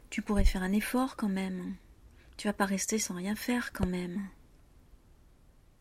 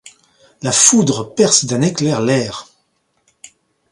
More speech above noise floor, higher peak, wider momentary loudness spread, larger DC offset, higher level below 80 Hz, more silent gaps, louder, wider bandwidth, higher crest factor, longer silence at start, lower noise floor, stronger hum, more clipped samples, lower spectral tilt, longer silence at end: second, 29 dB vs 50 dB; second, -14 dBFS vs 0 dBFS; second, 11 LU vs 14 LU; neither; first, -38 dBFS vs -56 dBFS; neither; second, -33 LUFS vs -14 LUFS; first, 16 kHz vs 14.5 kHz; about the same, 20 dB vs 18 dB; about the same, 0.05 s vs 0.05 s; second, -60 dBFS vs -64 dBFS; neither; neither; about the same, -4.5 dB/octave vs -3.5 dB/octave; first, 1.45 s vs 1.3 s